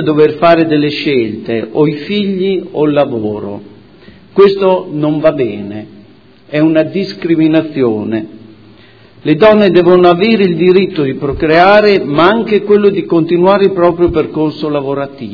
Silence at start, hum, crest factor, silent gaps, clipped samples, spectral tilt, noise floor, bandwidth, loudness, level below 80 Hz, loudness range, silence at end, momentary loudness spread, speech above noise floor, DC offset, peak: 0 s; none; 10 dB; none; 0.8%; -8.5 dB/octave; -41 dBFS; 5.4 kHz; -11 LUFS; -42 dBFS; 6 LU; 0 s; 11 LU; 31 dB; 0.4%; 0 dBFS